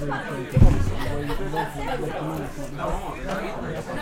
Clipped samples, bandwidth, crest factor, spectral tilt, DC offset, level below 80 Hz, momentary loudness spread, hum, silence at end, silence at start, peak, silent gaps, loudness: under 0.1%; 15.5 kHz; 20 dB; -7 dB/octave; under 0.1%; -28 dBFS; 11 LU; none; 0 s; 0 s; -2 dBFS; none; -27 LUFS